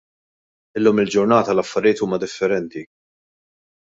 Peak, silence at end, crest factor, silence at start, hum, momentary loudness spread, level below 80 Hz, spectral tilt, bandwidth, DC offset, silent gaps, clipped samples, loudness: -2 dBFS; 0.95 s; 18 dB; 0.75 s; none; 13 LU; -60 dBFS; -5.5 dB/octave; 7.8 kHz; under 0.1%; none; under 0.1%; -19 LUFS